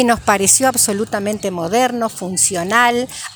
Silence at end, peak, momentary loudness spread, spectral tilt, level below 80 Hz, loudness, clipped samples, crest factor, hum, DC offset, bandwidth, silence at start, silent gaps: 0 s; 0 dBFS; 10 LU; -2.5 dB/octave; -48 dBFS; -15 LUFS; under 0.1%; 16 dB; none; under 0.1%; over 20 kHz; 0 s; none